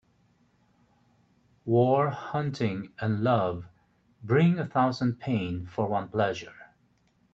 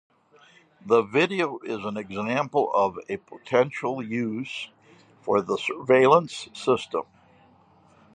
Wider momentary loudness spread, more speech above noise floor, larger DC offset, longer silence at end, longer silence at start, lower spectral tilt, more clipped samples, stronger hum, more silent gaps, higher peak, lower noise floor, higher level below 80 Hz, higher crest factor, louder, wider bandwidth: second, 11 LU vs 15 LU; first, 41 dB vs 33 dB; neither; second, 0.7 s vs 1.15 s; first, 1.65 s vs 0.85 s; first, -8 dB/octave vs -5.5 dB/octave; neither; neither; neither; second, -10 dBFS vs -4 dBFS; first, -67 dBFS vs -57 dBFS; about the same, -64 dBFS vs -68 dBFS; about the same, 18 dB vs 22 dB; about the same, -27 LUFS vs -25 LUFS; second, 7.6 kHz vs 10 kHz